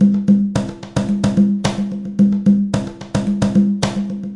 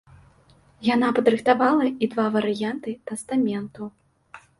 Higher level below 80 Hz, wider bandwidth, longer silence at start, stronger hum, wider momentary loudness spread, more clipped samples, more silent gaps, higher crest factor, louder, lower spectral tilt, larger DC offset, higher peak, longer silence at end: first, -42 dBFS vs -64 dBFS; about the same, 11 kHz vs 11.5 kHz; second, 0 s vs 0.8 s; neither; second, 9 LU vs 14 LU; neither; neither; second, 14 dB vs 20 dB; first, -17 LUFS vs -23 LUFS; first, -7 dB/octave vs -5.5 dB/octave; neither; about the same, -2 dBFS vs -4 dBFS; second, 0 s vs 0.2 s